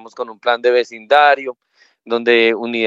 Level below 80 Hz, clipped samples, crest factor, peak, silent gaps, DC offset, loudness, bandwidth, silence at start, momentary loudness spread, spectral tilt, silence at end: -72 dBFS; under 0.1%; 16 dB; 0 dBFS; none; under 0.1%; -15 LUFS; 7.6 kHz; 0.05 s; 11 LU; -4 dB/octave; 0 s